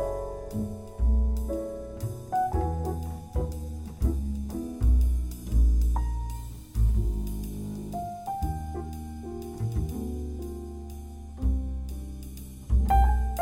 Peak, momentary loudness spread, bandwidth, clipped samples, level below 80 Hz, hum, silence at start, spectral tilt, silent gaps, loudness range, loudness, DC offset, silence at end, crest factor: -12 dBFS; 14 LU; 16 kHz; under 0.1%; -28 dBFS; none; 0 s; -8 dB/octave; none; 6 LU; -30 LUFS; under 0.1%; 0 s; 16 dB